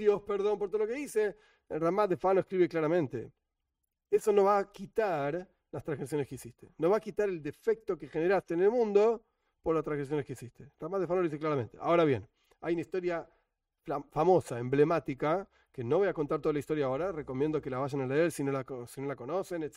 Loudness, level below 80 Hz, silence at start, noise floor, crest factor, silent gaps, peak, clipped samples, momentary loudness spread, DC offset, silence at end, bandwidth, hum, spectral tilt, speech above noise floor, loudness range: -31 LUFS; -64 dBFS; 0 s; -85 dBFS; 18 dB; none; -14 dBFS; under 0.1%; 12 LU; under 0.1%; 0.05 s; 15.5 kHz; none; -7 dB/octave; 54 dB; 3 LU